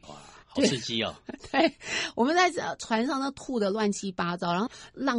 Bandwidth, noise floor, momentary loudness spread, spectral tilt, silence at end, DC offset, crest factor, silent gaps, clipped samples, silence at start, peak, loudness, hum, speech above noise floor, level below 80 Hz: 11 kHz; -48 dBFS; 9 LU; -4 dB/octave; 0 s; under 0.1%; 18 dB; none; under 0.1%; 0.05 s; -10 dBFS; -28 LUFS; none; 20 dB; -62 dBFS